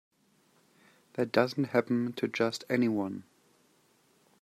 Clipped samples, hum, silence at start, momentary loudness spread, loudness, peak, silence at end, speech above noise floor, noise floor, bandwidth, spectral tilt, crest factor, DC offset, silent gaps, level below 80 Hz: under 0.1%; none; 1.15 s; 9 LU; -30 LUFS; -10 dBFS; 1.2 s; 38 dB; -68 dBFS; 14.5 kHz; -6 dB/octave; 24 dB; under 0.1%; none; -78 dBFS